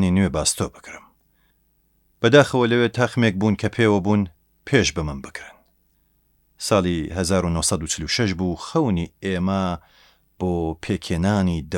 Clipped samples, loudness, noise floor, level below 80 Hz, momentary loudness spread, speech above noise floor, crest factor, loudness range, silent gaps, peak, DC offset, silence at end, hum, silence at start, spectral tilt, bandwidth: under 0.1%; -21 LUFS; -64 dBFS; -42 dBFS; 12 LU; 43 dB; 22 dB; 5 LU; none; 0 dBFS; under 0.1%; 0 s; none; 0 s; -5 dB/octave; 17 kHz